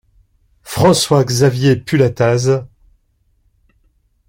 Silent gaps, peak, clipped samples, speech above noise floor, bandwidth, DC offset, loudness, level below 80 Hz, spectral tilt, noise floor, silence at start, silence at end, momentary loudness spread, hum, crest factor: none; -2 dBFS; under 0.1%; 47 dB; 16.5 kHz; under 0.1%; -14 LUFS; -48 dBFS; -5.5 dB/octave; -60 dBFS; 0.65 s; 1.65 s; 5 LU; none; 14 dB